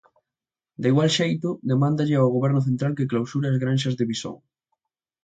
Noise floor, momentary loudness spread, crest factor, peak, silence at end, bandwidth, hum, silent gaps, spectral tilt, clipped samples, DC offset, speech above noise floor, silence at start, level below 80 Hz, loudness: -90 dBFS; 7 LU; 16 dB; -8 dBFS; 0.9 s; 9 kHz; none; none; -6.5 dB/octave; under 0.1%; under 0.1%; 68 dB; 0.8 s; -64 dBFS; -23 LUFS